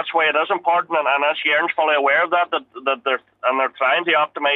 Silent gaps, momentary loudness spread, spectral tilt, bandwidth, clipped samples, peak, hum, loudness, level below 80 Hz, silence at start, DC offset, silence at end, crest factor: none; 6 LU; -4.5 dB/octave; 6.6 kHz; under 0.1%; -4 dBFS; none; -18 LUFS; -78 dBFS; 0 s; under 0.1%; 0 s; 14 dB